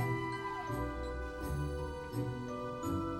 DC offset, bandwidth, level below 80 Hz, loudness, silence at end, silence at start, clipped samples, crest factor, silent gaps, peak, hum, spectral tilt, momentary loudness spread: under 0.1%; 16 kHz; -48 dBFS; -39 LUFS; 0 s; 0 s; under 0.1%; 16 dB; none; -22 dBFS; none; -6.5 dB/octave; 4 LU